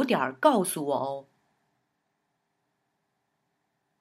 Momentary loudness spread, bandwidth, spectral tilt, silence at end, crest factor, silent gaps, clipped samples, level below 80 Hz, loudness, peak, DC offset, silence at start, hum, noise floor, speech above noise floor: 11 LU; 16 kHz; -4.5 dB/octave; 2.8 s; 24 dB; none; under 0.1%; -88 dBFS; -26 LUFS; -8 dBFS; under 0.1%; 0 s; none; -78 dBFS; 52 dB